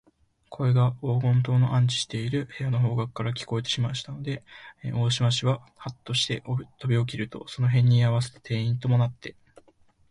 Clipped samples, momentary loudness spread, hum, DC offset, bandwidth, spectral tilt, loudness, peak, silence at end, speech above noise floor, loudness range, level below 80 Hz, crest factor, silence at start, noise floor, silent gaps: under 0.1%; 12 LU; none; under 0.1%; 11 kHz; -6 dB/octave; -26 LUFS; -12 dBFS; 0.8 s; 35 dB; 3 LU; -58 dBFS; 14 dB; 0.5 s; -60 dBFS; none